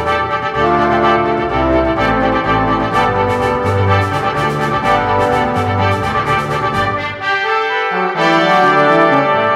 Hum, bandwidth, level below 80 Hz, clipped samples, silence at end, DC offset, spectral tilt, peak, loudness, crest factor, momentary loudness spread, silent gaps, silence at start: none; 14.5 kHz; -34 dBFS; under 0.1%; 0 s; under 0.1%; -6 dB/octave; 0 dBFS; -14 LUFS; 14 dB; 5 LU; none; 0 s